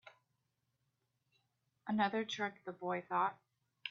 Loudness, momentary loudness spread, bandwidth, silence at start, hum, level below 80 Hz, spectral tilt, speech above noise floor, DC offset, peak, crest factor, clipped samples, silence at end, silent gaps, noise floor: -38 LUFS; 11 LU; 7 kHz; 0.05 s; none; -86 dBFS; -3 dB/octave; 46 dB; under 0.1%; -22 dBFS; 20 dB; under 0.1%; 0 s; none; -84 dBFS